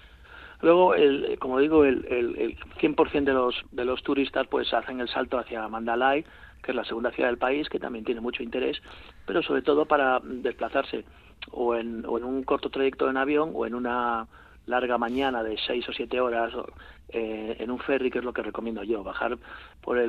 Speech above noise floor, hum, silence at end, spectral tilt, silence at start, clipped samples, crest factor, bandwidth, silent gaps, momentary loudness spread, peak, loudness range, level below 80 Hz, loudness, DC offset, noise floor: 21 dB; none; 0 s; -7 dB/octave; 0.05 s; under 0.1%; 20 dB; 4.8 kHz; none; 11 LU; -6 dBFS; 6 LU; -54 dBFS; -27 LUFS; under 0.1%; -48 dBFS